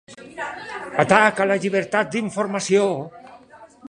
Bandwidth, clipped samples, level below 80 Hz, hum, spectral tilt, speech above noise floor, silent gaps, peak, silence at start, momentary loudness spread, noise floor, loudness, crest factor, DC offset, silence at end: 11 kHz; under 0.1%; -62 dBFS; none; -4.5 dB/octave; 27 dB; none; -2 dBFS; 0.1 s; 17 LU; -46 dBFS; -20 LUFS; 20 dB; under 0.1%; 0.05 s